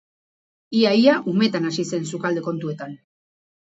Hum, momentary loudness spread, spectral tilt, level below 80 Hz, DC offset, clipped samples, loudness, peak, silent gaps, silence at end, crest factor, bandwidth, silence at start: none; 14 LU; -5.5 dB/octave; -70 dBFS; under 0.1%; under 0.1%; -21 LUFS; -2 dBFS; none; 0.75 s; 20 dB; 8 kHz; 0.7 s